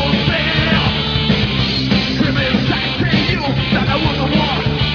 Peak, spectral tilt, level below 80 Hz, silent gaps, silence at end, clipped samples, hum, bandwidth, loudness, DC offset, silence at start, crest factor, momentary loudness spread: 0 dBFS; -6.5 dB/octave; -28 dBFS; none; 0 s; under 0.1%; none; 5.4 kHz; -15 LUFS; under 0.1%; 0 s; 14 dB; 2 LU